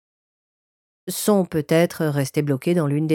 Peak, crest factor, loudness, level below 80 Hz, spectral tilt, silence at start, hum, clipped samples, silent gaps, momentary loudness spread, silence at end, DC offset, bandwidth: -6 dBFS; 16 dB; -21 LUFS; -62 dBFS; -6 dB/octave; 1.05 s; none; under 0.1%; none; 5 LU; 0 s; under 0.1%; 18 kHz